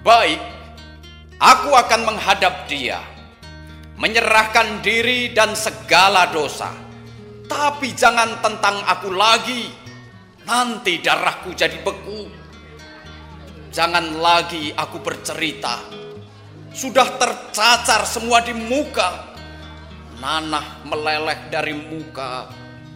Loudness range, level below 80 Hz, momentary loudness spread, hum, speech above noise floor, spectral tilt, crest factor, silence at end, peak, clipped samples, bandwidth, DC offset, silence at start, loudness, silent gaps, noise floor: 6 LU; -46 dBFS; 24 LU; none; 24 dB; -2 dB/octave; 18 dB; 0 s; 0 dBFS; under 0.1%; 16 kHz; under 0.1%; 0 s; -17 LUFS; none; -42 dBFS